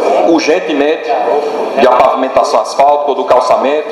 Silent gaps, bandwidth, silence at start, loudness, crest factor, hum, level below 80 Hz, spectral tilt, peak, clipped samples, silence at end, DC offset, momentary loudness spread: none; 12 kHz; 0 s; -10 LUFS; 10 dB; none; -48 dBFS; -4 dB/octave; 0 dBFS; 0.5%; 0 s; under 0.1%; 4 LU